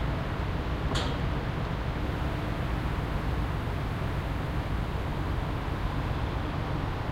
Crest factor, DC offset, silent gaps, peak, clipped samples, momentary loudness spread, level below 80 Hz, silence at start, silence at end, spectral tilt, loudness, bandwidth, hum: 14 dB; under 0.1%; none; -16 dBFS; under 0.1%; 2 LU; -34 dBFS; 0 s; 0 s; -6.5 dB/octave; -32 LUFS; 16 kHz; none